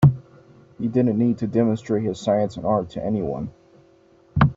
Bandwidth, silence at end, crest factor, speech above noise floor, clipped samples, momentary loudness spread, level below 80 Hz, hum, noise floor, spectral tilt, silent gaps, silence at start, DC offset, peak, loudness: 7.8 kHz; 0.05 s; 18 dB; 33 dB; under 0.1%; 10 LU; -46 dBFS; none; -55 dBFS; -8.5 dB/octave; none; 0 s; under 0.1%; -4 dBFS; -23 LUFS